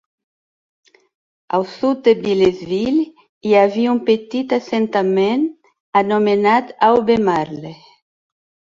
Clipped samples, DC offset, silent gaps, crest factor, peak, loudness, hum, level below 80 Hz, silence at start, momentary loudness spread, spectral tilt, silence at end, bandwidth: under 0.1%; under 0.1%; 3.29-3.41 s, 5.80-5.93 s; 16 dB; -2 dBFS; -17 LUFS; none; -56 dBFS; 1.5 s; 8 LU; -6.5 dB/octave; 1 s; 7.6 kHz